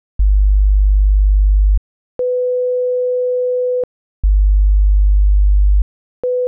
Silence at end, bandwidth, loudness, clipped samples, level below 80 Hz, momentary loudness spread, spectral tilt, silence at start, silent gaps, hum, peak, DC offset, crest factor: 0 s; 0.8 kHz; -16 LUFS; under 0.1%; -14 dBFS; 7 LU; -14 dB/octave; 0.2 s; 1.78-2.19 s, 3.84-4.23 s, 5.82-6.23 s; none; -8 dBFS; under 0.1%; 6 dB